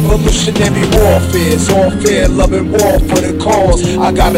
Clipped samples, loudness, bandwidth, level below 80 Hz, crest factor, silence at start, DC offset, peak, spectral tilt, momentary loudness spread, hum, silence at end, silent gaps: 0.1%; -11 LUFS; 16.5 kHz; -18 dBFS; 10 dB; 0 s; under 0.1%; 0 dBFS; -5 dB/octave; 2 LU; none; 0 s; none